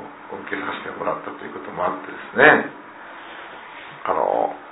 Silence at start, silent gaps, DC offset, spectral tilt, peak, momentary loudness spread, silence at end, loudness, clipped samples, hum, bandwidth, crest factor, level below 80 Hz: 0 s; none; under 0.1%; -8.5 dB/octave; 0 dBFS; 23 LU; 0 s; -21 LUFS; under 0.1%; none; 4 kHz; 22 dB; -62 dBFS